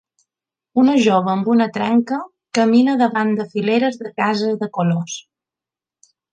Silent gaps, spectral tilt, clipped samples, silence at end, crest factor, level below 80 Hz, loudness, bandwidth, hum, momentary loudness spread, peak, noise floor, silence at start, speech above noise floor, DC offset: none; -6 dB/octave; under 0.1%; 1.15 s; 16 dB; -68 dBFS; -18 LUFS; 9 kHz; none; 9 LU; -2 dBFS; -89 dBFS; 0.75 s; 72 dB; under 0.1%